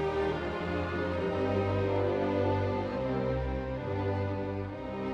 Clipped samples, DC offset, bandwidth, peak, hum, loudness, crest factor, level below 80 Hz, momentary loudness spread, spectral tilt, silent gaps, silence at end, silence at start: under 0.1%; under 0.1%; 7.6 kHz; -18 dBFS; none; -32 LUFS; 14 dB; -46 dBFS; 6 LU; -8.5 dB/octave; none; 0 s; 0 s